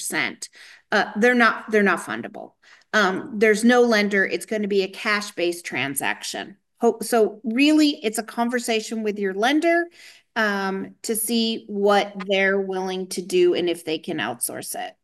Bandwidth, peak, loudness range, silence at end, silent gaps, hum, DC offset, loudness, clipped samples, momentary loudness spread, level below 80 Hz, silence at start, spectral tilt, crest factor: 13 kHz; -4 dBFS; 3 LU; 0.1 s; none; none; under 0.1%; -22 LUFS; under 0.1%; 12 LU; -72 dBFS; 0 s; -3.5 dB/octave; 18 dB